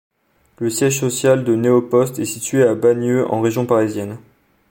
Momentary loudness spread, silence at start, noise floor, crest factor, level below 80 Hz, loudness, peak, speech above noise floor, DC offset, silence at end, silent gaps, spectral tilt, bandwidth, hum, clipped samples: 9 LU; 0.6 s; -57 dBFS; 16 dB; -60 dBFS; -17 LUFS; -2 dBFS; 40 dB; under 0.1%; 0.5 s; none; -5.5 dB/octave; 17 kHz; none; under 0.1%